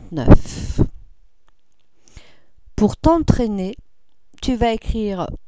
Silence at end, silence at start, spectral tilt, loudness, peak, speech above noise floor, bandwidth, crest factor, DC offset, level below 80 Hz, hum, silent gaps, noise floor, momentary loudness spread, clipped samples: 0.1 s; 0 s; -7.5 dB/octave; -19 LUFS; 0 dBFS; 49 dB; 8 kHz; 18 dB; 0.8%; -26 dBFS; none; none; -65 dBFS; 13 LU; 0.1%